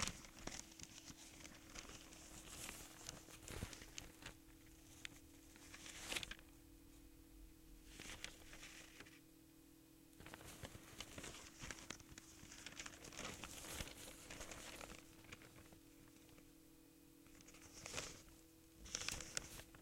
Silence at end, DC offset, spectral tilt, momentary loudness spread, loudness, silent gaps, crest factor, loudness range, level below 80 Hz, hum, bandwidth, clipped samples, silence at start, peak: 0 s; under 0.1%; -2 dB/octave; 17 LU; -53 LUFS; none; 34 dB; 5 LU; -66 dBFS; none; 16.5 kHz; under 0.1%; 0 s; -22 dBFS